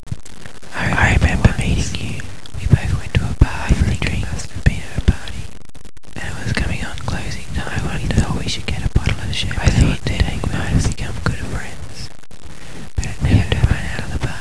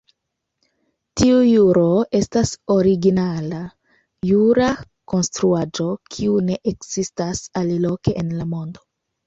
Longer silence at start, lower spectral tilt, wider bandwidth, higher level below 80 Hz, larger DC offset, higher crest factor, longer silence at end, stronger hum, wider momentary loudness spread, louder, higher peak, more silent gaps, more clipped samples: second, 0 s vs 1.15 s; about the same, -5.5 dB/octave vs -6 dB/octave; first, 11 kHz vs 8.2 kHz; first, -24 dBFS vs -46 dBFS; first, 7% vs under 0.1%; first, 20 dB vs 14 dB; second, 0 s vs 0.55 s; neither; first, 17 LU vs 13 LU; about the same, -20 LUFS vs -19 LUFS; first, 0 dBFS vs -4 dBFS; neither; neither